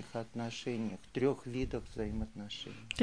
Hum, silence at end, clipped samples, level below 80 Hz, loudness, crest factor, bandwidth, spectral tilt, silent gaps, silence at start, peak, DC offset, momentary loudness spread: none; 0 s; under 0.1%; -50 dBFS; -39 LUFS; 20 dB; 10.5 kHz; -5.5 dB/octave; none; 0 s; -16 dBFS; 0.1%; 9 LU